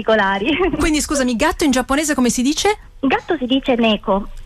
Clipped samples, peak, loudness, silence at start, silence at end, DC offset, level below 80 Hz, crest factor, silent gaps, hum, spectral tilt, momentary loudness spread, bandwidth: under 0.1%; -6 dBFS; -17 LUFS; 0 s; 0 s; under 0.1%; -34 dBFS; 12 dB; none; none; -3.5 dB/octave; 4 LU; 14.5 kHz